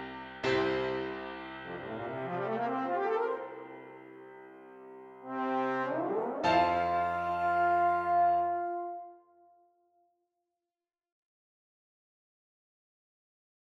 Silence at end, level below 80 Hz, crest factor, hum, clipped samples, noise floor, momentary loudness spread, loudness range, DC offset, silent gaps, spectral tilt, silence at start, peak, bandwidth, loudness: 4.55 s; -66 dBFS; 20 dB; none; under 0.1%; under -90 dBFS; 23 LU; 7 LU; under 0.1%; none; -6 dB/octave; 0 s; -14 dBFS; 7.8 kHz; -32 LUFS